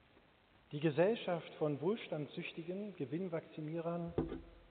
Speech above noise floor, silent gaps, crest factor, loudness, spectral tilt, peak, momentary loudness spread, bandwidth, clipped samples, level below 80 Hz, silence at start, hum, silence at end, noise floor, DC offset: 29 dB; none; 20 dB; -40 LUFS; -6 dB/octave; -20 dBFS; 11 LU; 4.6 kHz; under 0.1%; -64 dBFS; 0.7 s; none; 0.05 s; -68 dBFS; under 0.1%